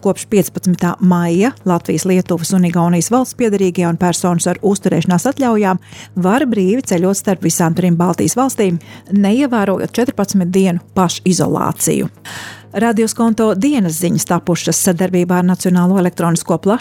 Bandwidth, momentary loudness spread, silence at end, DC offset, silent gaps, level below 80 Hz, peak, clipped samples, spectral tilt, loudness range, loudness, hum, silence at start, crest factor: 17 kHz; 4 LU; 0 s; under 0.1%; none; -52 dBFS; -2 dBFS; under 0.1%; -5.5 dB/octave; 1 LU; -14 LUFS; none; 0.05 s; 12 dB